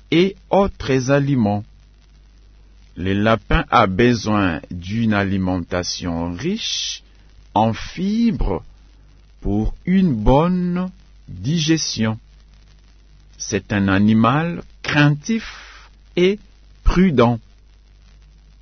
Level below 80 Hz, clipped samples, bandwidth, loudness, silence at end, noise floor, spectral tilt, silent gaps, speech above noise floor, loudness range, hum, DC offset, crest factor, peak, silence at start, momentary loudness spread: -32 dBFS; under 0.1%; 6.6 kHz; -19 LUFS; 1.25 s; -48 dBFS; -5.5 dB/octave; none; 30 dB; 4 LU; none; under 0.1%; 18 dB; -2 dBFS; 0.1 s; 12 LU